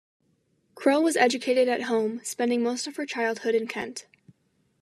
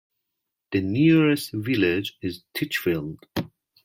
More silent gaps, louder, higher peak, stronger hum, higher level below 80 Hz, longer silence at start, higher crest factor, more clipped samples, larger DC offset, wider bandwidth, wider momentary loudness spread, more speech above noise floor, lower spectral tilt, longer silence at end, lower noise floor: neither; about the same, -25 LUFS vs -24 LUFS; about the same, -6 dBFS vs -8 dBFS; neither; second, -82 dBFS vs -60 dBFS; about the same, 0.75 s vs 0.7 s; about the same, 20 dB vs 16 dB; neither; neither; second, 13.5 kHz vs 16.5 kHz; second, 10 LU vs 14 LU; second, 44 dB vs 59 dB; second, -3 dB/octave vs -6 dB/octave; first, 0.8 s vs 0.4 s; second, -69 dBFS vs -82 dBFS